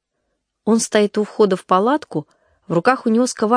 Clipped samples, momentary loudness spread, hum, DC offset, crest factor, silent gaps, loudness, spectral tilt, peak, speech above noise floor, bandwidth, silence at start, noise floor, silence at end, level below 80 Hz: under 0.1%; 9 LU; none; under 0.1%; 18 dB; none; -18 LUFS; -5 dB/octave; 0 dBFS; 56 dB; 10.5 kHz; 0.65 s; -73 dBFS; 0 s; -68 dBFS